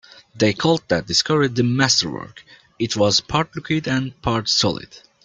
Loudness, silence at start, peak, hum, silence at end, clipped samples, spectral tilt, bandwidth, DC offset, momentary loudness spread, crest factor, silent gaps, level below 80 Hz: -19 LUFS; 0.35 s; -2 dBFS; none; 0.25 s; under 0.1%; -4 dB/octave; 11 kHz; under 0.1%; 9 LU; 18 dB; none; -48 dBFS